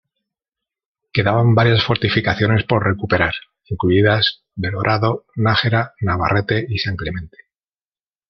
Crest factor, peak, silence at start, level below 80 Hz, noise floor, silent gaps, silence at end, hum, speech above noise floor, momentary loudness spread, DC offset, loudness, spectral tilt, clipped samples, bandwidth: 16 dB; -2 dBFS; 1.15 s; -44 dBFS; under -90 dBFS; none; 1 s; none; over 73 dB; 10 LU; under 0.1%; -17 LUFS; -7.5 dB/octave; under 0.1%; 6.2 kHz